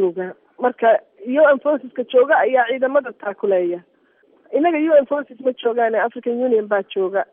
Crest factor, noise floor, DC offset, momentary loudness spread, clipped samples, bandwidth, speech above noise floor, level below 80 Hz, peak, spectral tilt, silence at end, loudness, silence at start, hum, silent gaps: 14 dB; -57 dBFS; under 0.1%; 10 LU; under 0.1%; 3.7 kHz; 39 dB; -76 dBFS; -4 dBFS; -3 dB/octave; 0.1 s; -18 LUFS; 0 s; none; none